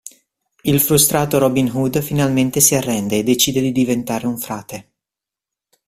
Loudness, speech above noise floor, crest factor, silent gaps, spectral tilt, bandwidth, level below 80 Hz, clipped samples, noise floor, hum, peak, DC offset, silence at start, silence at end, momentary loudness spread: -16 LUFS; 70 dB; 18 dB; none; -4 dB/octave; 16 kHz; -48 dBFS; under 0.1%; -87 dBFS; none; 0 dBFS; under 0.1%; 0.05 s; 1.05 s; 13 LU